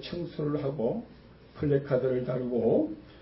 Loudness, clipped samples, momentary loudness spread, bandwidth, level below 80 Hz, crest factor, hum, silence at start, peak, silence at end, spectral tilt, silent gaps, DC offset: -30 LUFS; under 0.1%; 9 LU; 5.8 kHz; -56 dBFS; 16 dB; none; 0 s; -14 dBFS; 0 s; -11.5 dB/octave; none; under 0.1%